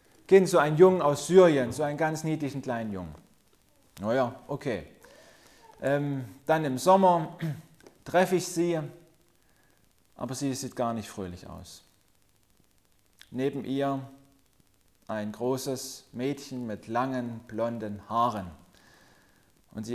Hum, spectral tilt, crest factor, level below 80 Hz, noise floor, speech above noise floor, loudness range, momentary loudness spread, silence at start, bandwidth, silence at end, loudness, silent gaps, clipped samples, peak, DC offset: none; -6 dB/octave; 22 dB; -62 dBFS; -67 dBFS; 40 dB; 11 LU; 19 LU; 0.3 s; 15 kHz; 0 s; -27 LUFS; none; under 0.1%; -6 dBFS; under 0.1%